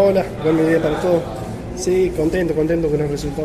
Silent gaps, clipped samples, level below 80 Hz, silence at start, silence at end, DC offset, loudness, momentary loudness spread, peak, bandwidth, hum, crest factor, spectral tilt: none; under 0.1%; -36 dBFS; 0 s; 0 s; under 0.1%; -19 LUFS; 8 LU; -4 dBFS; 14.5 kHz; none; 14 dB; -6.5 dB/octave